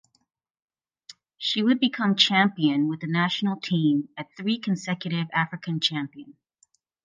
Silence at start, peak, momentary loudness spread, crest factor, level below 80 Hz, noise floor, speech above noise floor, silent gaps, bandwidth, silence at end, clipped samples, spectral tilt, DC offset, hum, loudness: 1.1 s; -2 dBFS; 9 LU; 24 dB; -76 dBFS; -67 dBFS; 42 dB; none; 9.6 kHz; 0.75 s; under 0.1%; -5 dB/octave; under 0.1%; none; -24 LUFS